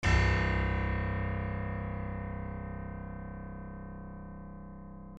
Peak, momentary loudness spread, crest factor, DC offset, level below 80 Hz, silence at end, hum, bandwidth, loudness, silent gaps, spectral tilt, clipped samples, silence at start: -16 dBFS; 18 LU; 18 dB; under 0.1%; -38 dBFS; 0 s; none; 8 kHz; -35 LUFS; none; -6.5 dB/octave; under 0.1%; 0 s